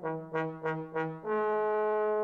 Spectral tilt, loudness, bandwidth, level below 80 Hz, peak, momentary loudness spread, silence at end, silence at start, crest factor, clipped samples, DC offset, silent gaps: -8.5 dB/octave; -32 LUFS; 4.4 kHz; -72 dBFS; -20 dBFS; 6 LU; 0 s; 0 s; 12 dB; under 0.1%; under 0.1%; none